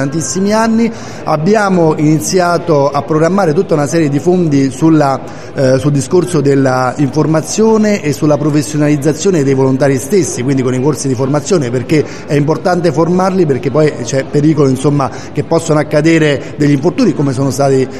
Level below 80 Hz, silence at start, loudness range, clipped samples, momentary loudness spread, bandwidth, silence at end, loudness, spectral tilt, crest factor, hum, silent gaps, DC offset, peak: -46 dBFS; 0 s; 1 LU; under 0.1%; 4 LU; 13.5 kHz; 0 s; -11 LUFS; -6 dB/octave; 10 dB; none; none; 3%; 0 dBFS